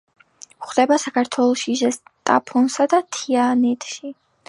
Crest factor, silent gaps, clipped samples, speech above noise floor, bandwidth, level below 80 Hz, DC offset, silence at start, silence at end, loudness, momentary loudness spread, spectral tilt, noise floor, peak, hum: 18 dB; none; under 0.1%; 20 dB; 11.5 kHz; -74 dBFS; under 0.1%; 0.6 s; 0.35 s; -19 LUFS; 11 LU; -3 dB/octave; -39 dBFS; -2 dBFS; none